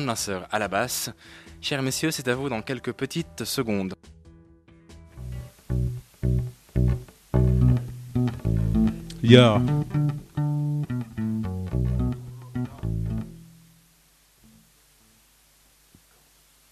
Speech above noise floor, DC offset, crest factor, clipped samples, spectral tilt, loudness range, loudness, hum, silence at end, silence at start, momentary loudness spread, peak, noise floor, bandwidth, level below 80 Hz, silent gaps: 36 dB; under 0.1%; 26 dB; under 0.1%; -6 dB/octave; 11 LU; -25 LUFS; none; 3.25 s; 0 s; 13 LU; 0 dBFS; -60 dBFS; 14.5 kHz; -36 dBFS; none